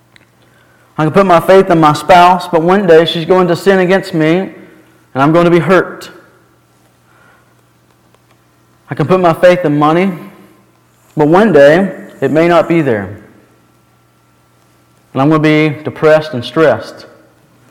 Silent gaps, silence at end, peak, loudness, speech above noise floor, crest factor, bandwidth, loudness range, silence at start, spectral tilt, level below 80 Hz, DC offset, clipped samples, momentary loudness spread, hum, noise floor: none; 0.7 s; 0 dBFS; -9 LUFS; 41 dB; 12 dB; 16.5 kHz; 7 LU; 1 s; -7 dB/octave; -46 dBFS; under 0.1%; 0.8%; 13 LU; 60 Hz at -40 dBFS; -50 dBFS